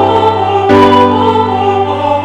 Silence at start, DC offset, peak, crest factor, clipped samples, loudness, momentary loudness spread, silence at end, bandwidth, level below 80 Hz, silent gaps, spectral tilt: 0 s; under 0.1%; 0 dBFS; 8 dB; 2%; -9 LUFS; 6 LU; 0 s; 10 kHz; -44 dBFS; none; -7 dB/octave